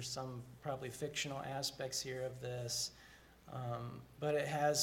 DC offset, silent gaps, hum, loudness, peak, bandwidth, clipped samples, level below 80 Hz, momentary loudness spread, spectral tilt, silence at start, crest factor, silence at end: under 0.1%; none; none; -41 LUFS; -22 dBFS; 17 kHz; under 0.1%; -70 dBFS; 12 LU; -3.5 dB/octave; 0 s; 20 dB; 0 s